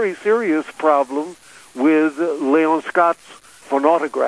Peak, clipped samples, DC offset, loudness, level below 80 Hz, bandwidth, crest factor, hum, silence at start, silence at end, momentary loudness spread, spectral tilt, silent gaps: -2 dBFS; under 0.1%; under 0.1%; -18 LUFS; -68 dBFS; 11 kHz; 16 dB; none; 0 s; 0 s; 9 LU; -5.5 dB/octave; none